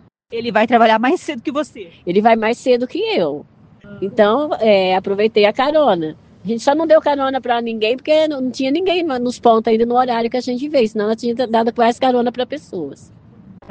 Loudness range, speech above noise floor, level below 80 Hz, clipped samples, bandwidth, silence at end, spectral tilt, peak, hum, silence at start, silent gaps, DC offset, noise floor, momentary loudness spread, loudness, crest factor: 3 LU; 26 dB; -56 dBFS; under 0.1%; 9.2 kHz; 0.75 s; -5.5 dB/octave; 0 dBFS; none; 0.3 s; none; under 0.1%; -42 dBFS; 11 LU; -16 LUFS; 16 dB